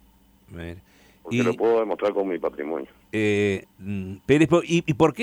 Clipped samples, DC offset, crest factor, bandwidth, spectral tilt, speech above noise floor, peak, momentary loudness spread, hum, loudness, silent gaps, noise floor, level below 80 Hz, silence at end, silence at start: under 0.1%; under 0.1%; 18 dB; 15.5 kHz; -6.5 dB/octave; 33 dB; -6 dBFS; 17 LU; none; -24 LUFS; none; -56 dBFS; -54 dBFS; 0 s; 0.5 s